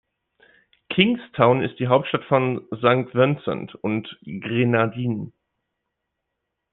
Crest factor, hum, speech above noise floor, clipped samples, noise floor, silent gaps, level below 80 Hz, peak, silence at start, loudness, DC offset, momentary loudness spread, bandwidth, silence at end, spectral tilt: 22 dB; none; 59 dB; under 0.1%; -80 dBFS; none; -62 dBFS; -2 dBFS; 0.9 s; -22 LUFS; under 0.1%; 10 LU; 4.1 kHz; 1.45 s; -10 dB/octave